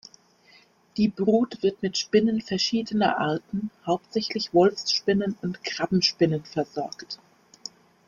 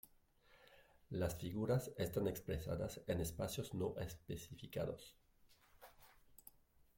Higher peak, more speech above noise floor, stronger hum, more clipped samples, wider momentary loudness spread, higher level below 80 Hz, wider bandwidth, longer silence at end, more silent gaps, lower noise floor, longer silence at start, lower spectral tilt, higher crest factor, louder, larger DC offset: first, -8 dBFS vs -26 dBFS; first, 33 dB vs 28 dB; neither; neither; second, 15 LU vs 23 LU; about the same, -62 dBFS vs -62 dBFS; second, 7.4 kHz vs 16.5 kHz; about the same, 0.4 s vs 0.45 s; neither; second, -57 dBFS vs -71 dBFS; first, 0.95 s vs 0.05 s; about the same, -5 dB/octave vs -6 dB/octave; about the same, 18 dB vs 20 dB; first, -25 LUFS vs -44 LUFS; neither